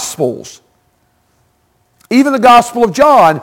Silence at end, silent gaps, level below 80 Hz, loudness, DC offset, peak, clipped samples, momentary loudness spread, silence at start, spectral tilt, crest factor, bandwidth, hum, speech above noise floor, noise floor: 0 s; none; -48 dBFS; -9 LUFS; under 0.1%; 0 dBFS; under 0.1%; 11 LU; 0 s; -4.5 dB/octave; 12 dB; 17 kHz; none; 48 dB; -57 dBFS